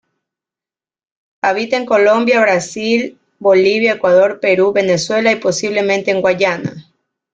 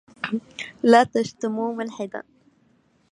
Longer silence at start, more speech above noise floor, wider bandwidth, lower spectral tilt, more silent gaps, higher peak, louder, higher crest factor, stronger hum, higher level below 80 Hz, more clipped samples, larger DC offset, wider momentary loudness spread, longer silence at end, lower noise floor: first, 1.45 s vs 0.25 s; first, over 77 dB vs 41 dB; second, 9.2 kHz vs 11 kHz; about the same, -4.5 dB/octave vs -5 dB/octave; neither; about the same, -2 dBFS vs -2 dBFS; first, -14 LUFS vs -23 LUFS; second, 14 dB vs 22 dB; neither; first, -58 dBFS vs -66 dBFS; neither; neither; second, 6 LU vs 17 LU; second, 0.55 s vs 0.9 s; first, under -90 dBFS vs -62 dBFS